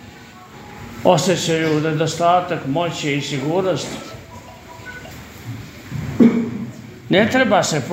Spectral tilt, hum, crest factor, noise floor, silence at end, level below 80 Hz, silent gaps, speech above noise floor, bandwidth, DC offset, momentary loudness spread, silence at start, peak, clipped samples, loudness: -5 dB/octave; none; 20 dB; -40 dBFS; 0 s; -50 dBFS; none; 22 dB; 16 kHz; under 0.1%; 22 LU; 0 s; 0 dBFS; under 0.1%; -18 LUFS